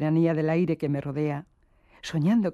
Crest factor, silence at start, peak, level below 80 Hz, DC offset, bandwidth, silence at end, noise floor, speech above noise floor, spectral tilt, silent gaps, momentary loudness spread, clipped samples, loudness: 12 dB; 0 s; -12 dBFS; -62 dBFS; under 0.1%; 11 kHz; 0 s; -59 dBFS; 35 dB; -8 dB/octave; none; 10 LU; under 0.1%; -26 LUFS